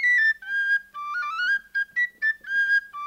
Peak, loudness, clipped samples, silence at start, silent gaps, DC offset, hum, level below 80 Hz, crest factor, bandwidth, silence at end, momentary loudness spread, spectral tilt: -14 dBFS; -23 LUFS; under 0.1%; 0 s; none; under 0.1%; none; -70 dBFS; 10 dB; 16 kHz; 0 s; 7 LU; 1.5 dB/octave